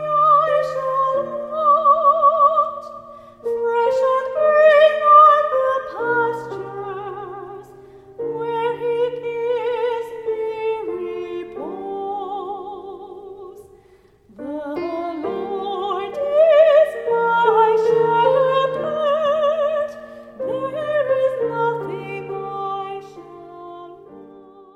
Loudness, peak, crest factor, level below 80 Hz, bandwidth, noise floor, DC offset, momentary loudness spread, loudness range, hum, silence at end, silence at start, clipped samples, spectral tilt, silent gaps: -18 LUFS; -2 dBFS; 18 dB; -62 dBFS; 9.2 kHz; -52 dBFS; under 0.1%; 21 LU; 14 LU; none; 0.35 s; 0 s; under 0.1%; -6 dB/octave; none